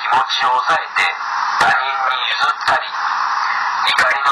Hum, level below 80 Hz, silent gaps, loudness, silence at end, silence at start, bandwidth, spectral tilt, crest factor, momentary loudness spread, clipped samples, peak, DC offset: none; -58 dBFS; none; -16 LUFS; 0 s; 0 s; 13 kHz; -0.5 dB/octave; 12 dB; 4 LU; under 0.1%; -6 dBFS; under 0.1%